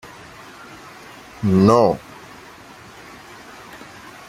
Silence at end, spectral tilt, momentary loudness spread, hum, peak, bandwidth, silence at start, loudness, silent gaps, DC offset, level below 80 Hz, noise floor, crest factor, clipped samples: 0.5 s; -7.5 dB/octave; 26 LU; none; -2 dBFS; 14.5 kHz; 0.05 s; -17 LUFS; none; under 0.1%; -54 dBFS; -42 dBFS; 20 dB; under 0.1%